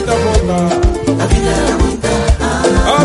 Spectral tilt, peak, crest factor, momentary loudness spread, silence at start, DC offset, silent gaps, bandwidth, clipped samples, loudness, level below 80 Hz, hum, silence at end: -5.5 dB/octave; 0 dBFS; 12 dB; 2 LU; 0 s; under 0.1%; none; 11.5 kHz; under 0.1%; -13 LUFS; -18 dBFS; none; 0 s